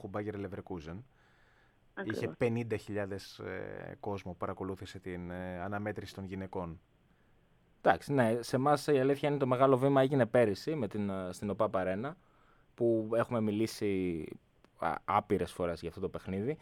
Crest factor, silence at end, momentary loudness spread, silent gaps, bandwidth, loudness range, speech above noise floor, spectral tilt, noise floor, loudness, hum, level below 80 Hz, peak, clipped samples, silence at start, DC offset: 24 dB; 0.05 s; 15 LU; none; 16.5 kHz; 11 LU; 34 dB; -7 dB/octave; -67 dBFS; -34 LUFS; none; -64 dBFS; -10 dBFS; under 0.1%; 0 s; under 0.1%